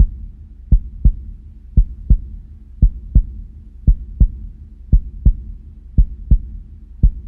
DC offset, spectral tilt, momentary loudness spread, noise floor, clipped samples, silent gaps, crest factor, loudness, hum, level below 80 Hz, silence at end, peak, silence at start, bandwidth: under 0.1%; -13.5 dB/octave; 20 LU; -34 dBFS; under 0.1%; none; 16 dB; -20 LUFS; none; -18 dBFS; 0 s; 0 dBFS; 0 s; 0.7 kHz